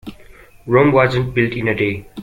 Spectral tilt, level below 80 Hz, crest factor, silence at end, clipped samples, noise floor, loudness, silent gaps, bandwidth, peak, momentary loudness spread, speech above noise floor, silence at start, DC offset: -8 dB/octave; -42 dBFS; 16 dB; 0 s; under 0.1%; -43 dBFS; -16 LUFS; none; 14 kHz; -2 dBFS; 8 LU; 27 dB; 0.05 s; under 0.1%